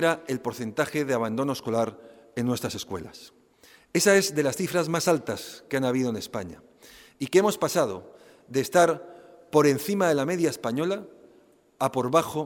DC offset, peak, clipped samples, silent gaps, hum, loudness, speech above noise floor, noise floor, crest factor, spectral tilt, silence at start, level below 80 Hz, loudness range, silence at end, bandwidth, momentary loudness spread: under 0.1%; -6 dBFS; under 0.1%; none; none; -26 LUFS; 33 dB; -58 dBFS; 20 dB; -4.5 dB/octave; 0 s; -64 dBFS; 4 LU; 0 s; 18 kHz; 13 LU